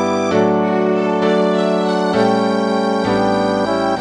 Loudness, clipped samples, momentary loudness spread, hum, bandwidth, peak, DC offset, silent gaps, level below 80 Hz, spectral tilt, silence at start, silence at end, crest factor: -16 LUFS; under 0.1%; 2 LU; none; 10.5 kHz; -2 dBFS; under 0.1%; none; -50 dBFS; -6 dB/octave; 0 s; 0 s; 14 dB